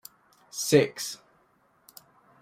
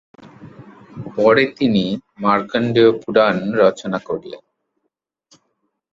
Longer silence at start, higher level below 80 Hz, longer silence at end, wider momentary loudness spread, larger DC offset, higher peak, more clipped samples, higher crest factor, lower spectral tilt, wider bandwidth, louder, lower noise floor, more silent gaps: first, 0.55 s vs 0.4 s; second, -72 dBFS vs -58 dBFS; second, 1.25 s vs 1.55 s; first, 18 LU vs 14 LU; neither; second, -6 dBFS vs -2 dBFS; neither; first, 24 dB vs 18 dB; second, -4 dB/octave vs -6.5 dB/octave; first, 16 kHz vs 7.6 kHz; second, -26 LUFS vs -17 LUFS; second, -66 dBFS vs -75 dBFS; neither